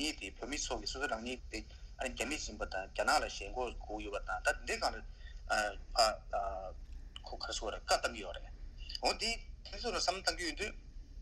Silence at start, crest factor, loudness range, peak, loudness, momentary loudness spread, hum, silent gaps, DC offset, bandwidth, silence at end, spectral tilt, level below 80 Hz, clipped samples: 0 s; 22 dB; 2 LU; -16 dBFS; -37 LUFS; 17 LU; none; none; under 0.1%; 15.5 kHz; 0 s; -2 dB/octave; -48 dBFS; under 0.1%